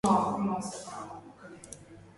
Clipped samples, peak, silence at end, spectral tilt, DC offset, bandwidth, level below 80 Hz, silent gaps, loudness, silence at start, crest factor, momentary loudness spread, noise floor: under 0.1%; -12 dBFS; 0.1 s; -6 dB/octave; under 0.1%; 11.5 kHz; -62 dBFS; none; -32 LUFS; 0.05 s; 20 dB; 22 LU; -50 dBFS